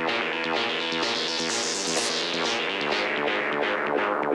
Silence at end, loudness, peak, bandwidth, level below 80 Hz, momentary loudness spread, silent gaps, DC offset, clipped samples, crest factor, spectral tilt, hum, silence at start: 0 s; -25 LUFS; -12 dBFS; 13 kHz; -68 dBFS; 1 LU; none; under 0.1%; under 0.1%; 14 dB; -1.5 dB/octave; none; 0 s